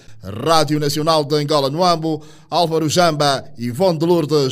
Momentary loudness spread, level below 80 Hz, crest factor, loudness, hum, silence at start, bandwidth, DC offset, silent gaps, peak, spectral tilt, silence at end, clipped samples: 9 LU; -52 dBFS; 16 dB; -17 LUFS; none; 0.1 s; 16 kHz; under 0.1%; none; -2 dBFS; -5 dB/octave; 0 s; under 0.1%